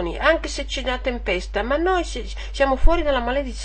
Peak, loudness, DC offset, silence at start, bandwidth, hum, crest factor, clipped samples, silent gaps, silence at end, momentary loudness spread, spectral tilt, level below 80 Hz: -2 dBFS; -22 LUFS; 0.4%; 0 s; 8.8 kHz; none; 18 dB; under 0.1%; none; 0 s; 7 LU; -4.5 dB/octave; -26 dBFS